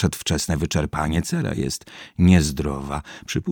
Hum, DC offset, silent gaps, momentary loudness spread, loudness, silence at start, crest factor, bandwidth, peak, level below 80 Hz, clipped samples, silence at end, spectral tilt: none; under 0.1%; none; 14 LU; -22 LUFS; 0 s; 20 dB; 18.5 kHz; -2 dBFS; -36 dBFS; under 0.1%; 0 s; -5.5 dB/octave